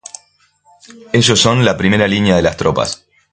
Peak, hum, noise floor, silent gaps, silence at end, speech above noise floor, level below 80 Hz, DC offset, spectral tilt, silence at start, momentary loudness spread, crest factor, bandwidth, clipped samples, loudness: 0 dBFS; none; -54 dBFS; none; 0.35 s; 41 dB; -38 dBFS; under 0.1%; -4.5 dB/octave; 1.15 s; 11 LU; 14 dB; 9.6 kHz; under 0.1%; -13 LUFS